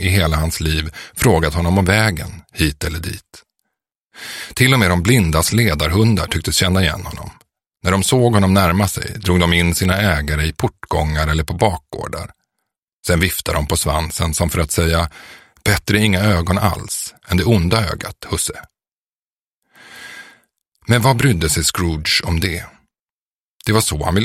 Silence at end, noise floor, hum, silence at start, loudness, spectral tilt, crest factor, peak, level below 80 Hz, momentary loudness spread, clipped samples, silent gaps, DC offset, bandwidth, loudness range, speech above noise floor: 0 s; under -90 dBFS; none; 0 s; -17 LUFS; -4.5 dB/octave; 18 dB; 0 dBFS; -30 dBFS; 14 LU; under 0.1%; 4.01-4.10 s, 12.78-12.87 s, 12.93-13.03 s, 18.92-19.62 s, 23.00-23.06 s, 23.12-23.60 s; under 0.1%; 16.5 kHz; 5 LU; over 74 dB